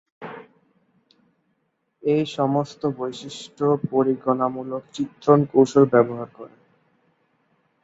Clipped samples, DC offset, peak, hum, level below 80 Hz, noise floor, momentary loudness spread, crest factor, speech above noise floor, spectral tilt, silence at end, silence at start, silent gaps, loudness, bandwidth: under 0.1%; under 0.1%; -2 dBFS; none; -66 dBFS; -72 dBFS; 20 LU; 20 dB; 51 dB; -7 dB/octave; 1.35 s; 0.2 s; none; -21 LUFS; 8 kHz